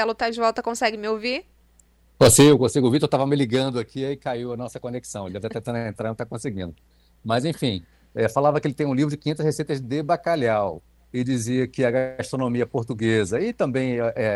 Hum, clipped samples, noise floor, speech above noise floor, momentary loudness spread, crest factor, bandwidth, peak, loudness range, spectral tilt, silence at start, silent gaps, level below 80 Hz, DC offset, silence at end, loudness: none; under 0.1%; -58 dBFS; 35 dB; 12 LU; 18 dB; 15.5 kHz; -4 dBFS; 9 LU; -5 dB/octave; 0 s; none; -52 dBFS; under 0.1%; 0 s; -23 LUFS